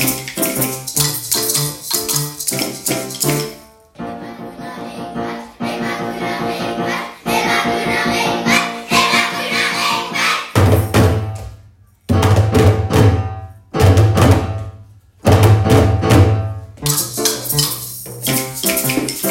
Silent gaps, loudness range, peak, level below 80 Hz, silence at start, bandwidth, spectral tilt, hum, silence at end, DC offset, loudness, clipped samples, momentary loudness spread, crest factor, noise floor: none; 9 LU; 0 dBFS; -36 dBFS; 0 s; 17 kHz; -4.5 dB/octave; none; 0 s; under 0.1%; -15 LUFS; under 0.1%; 15 LU; 16 dB; -46 dBFS